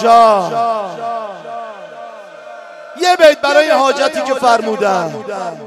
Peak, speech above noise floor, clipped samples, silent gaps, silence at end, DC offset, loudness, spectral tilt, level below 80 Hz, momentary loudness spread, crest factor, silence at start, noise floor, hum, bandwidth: 0 dBFS; 21 dB; 0.5%; none; 0 s; under 0.1%; -13 LUFS; -3.5 dB/octave; -60 dBFS; 24 LU; 14 dB; 0 s; -33 dBFS; none; 14 kHz